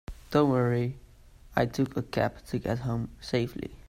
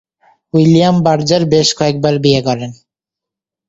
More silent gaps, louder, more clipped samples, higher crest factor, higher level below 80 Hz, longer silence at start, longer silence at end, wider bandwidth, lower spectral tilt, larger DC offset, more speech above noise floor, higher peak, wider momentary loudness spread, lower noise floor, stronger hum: neither; second, -29 LUFS vs -12 LUFS; neither; first, 20 dB vs 14 dB; about the same, -50 dBFS vs -48 dBFS; second, 0.1 s vs 0.55 s; second, 0.1 s vs 0.95 s; first, 15.5 kHz vs 7.8 kHz; first, -7 dB/octave vs -5.5 dB/octave; neither; second, 24 dB vs 73 dB; second, -10 dBFS vs 0 dBFS; about the same, 9 LU vs 9 LU; second, -52 dBFS vs -84 dBFS; neither